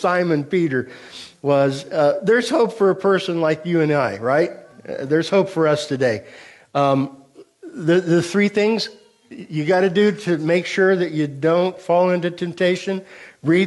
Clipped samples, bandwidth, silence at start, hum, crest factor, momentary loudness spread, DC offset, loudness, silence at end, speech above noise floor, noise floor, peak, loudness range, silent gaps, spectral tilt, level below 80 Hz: under 0.1%; 11.5 kHz; 0 s; none; 14 dB; 11 LU; under 0.1%; -19 LUFS; 0 s; 23 dB; -42 dBFS; -6 dBFS; 2 LU; none; -6 dB/octave; -66 dBFS